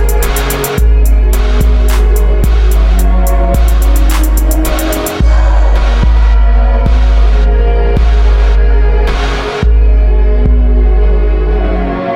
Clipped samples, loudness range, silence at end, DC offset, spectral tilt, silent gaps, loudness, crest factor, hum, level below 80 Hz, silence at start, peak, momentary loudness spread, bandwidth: under 0.1%; 1 LU; 0 s; under 0.1%; -6 dB/octave; none; -11 LUFS; 6 dB; none; -8 dBFS; 0 s; 0 dBFS; 3 LU; 16 kHz